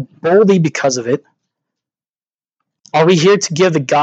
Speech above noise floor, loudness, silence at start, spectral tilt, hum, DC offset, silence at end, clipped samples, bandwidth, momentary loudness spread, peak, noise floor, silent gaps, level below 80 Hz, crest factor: over 78 dB; -13 LUFS; 0 s; -5 dB/octave; none; under 0.1%; 0 s; under 0.1%; 8.2 kHz; 8 LU; 0 dBFS; under -90 dBFS; 2.09-2.13 s, 2.34-2.38 s; -68 dBFS; 14 dB